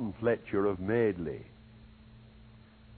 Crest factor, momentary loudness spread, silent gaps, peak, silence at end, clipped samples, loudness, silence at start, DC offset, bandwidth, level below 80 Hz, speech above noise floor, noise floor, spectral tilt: 18 dB; 14 LU; none; -16 dBFS; 0 s; under 0.1%; -31 LUFS; 0 s; under 0.1%; 4.5 kHz; -58 dBFS; 25 dB; -55 dBFS; -7 dB/octave